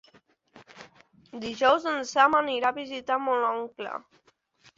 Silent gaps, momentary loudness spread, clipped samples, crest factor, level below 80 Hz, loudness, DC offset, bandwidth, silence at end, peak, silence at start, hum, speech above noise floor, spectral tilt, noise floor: none; 16 LU; under 0.1%; 22 dB; -70 dBFS; -26 LUFS; under 0.1%; 7.8 kHz; 0.8 s; -6 dBFS; 0.55 s; none; 36 dB; -2.5 dB/octave; -62 dBFS